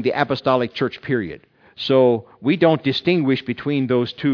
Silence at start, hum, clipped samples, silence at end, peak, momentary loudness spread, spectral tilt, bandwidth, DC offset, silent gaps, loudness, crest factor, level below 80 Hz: 0 s; none; under 0.1%; 0 s; -2 dBFS; 8 LU; -8 dB/octave; 5.4 kHz; under 0.1%; none; -19 LUFS; 18 dB; -60 dBFS